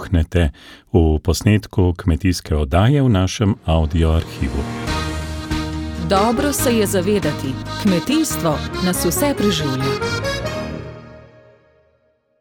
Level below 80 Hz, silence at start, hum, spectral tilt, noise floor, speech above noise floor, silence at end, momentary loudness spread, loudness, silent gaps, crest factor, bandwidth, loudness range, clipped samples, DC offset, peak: -28 dBFS; 0 s; none; -5.5 dB/octave; -61 dBFS; 44 dB; 1.2 s; 9 LU; -19 LUFS; none; 16 dB; 17.5 kHz; 3 LU; under 0.1%; under 0.1%; -2 dBFS